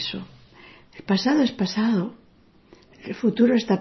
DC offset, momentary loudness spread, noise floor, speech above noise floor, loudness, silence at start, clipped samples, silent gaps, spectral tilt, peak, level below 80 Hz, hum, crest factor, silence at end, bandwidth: under 0.1%; 20 LU; -56 dBFS; 35 dB; -22 LUFS; 0 s; under 0.1%; none; -6 dB/octave; -8 dBFS; -60 dBFS; none; 16 dB; 0 s; 6.2 kHz